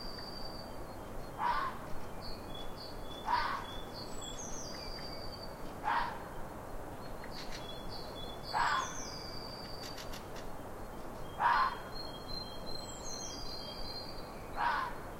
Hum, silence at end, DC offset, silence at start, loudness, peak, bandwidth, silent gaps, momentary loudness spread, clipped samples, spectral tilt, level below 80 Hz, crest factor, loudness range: none; 0 s; under 0.1%; 0 s; -40 LUFS; -18 dBFS; 16 kHz; none; 12 LU; under 0.1%; -3 dB/octave; -50 dBFS; 20 dB; 4 LU